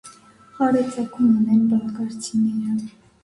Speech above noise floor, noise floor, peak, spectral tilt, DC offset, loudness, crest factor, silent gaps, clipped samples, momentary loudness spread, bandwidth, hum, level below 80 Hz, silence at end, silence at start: 27 dB; -47 dBFS; -8 dBFS; -6.5 dB/octave; under 0.1%; -21 LUFS; 14 dB; none; under 0.1%; 11 LU; 11.5 kHz; none; -62 dBFS; 0.35 s; 0.05 s